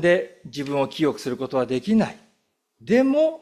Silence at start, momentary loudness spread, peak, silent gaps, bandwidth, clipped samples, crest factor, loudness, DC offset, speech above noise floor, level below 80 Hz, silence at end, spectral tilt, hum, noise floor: 0 s; 11 LU; -6 dBFS; none; 13.5 kHz; under 0.1%; 16 dB; -23 LUFS; under 0.1%; 49 dB; -64 dBFS; 0.05 s; -6.5 dB/octave; none; -70 dBFS